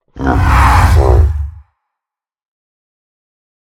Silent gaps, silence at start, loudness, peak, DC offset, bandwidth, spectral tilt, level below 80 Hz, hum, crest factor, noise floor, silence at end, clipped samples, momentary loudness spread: none; 0.15 s; -10 LUFS; 0 dBFS; under 0.1%; 14.5 kHz; -6.5 dB/octave; -16 dBFS; none; 14 dB; -84 dBFS; 2.15 s; under 0.1%; 11 LU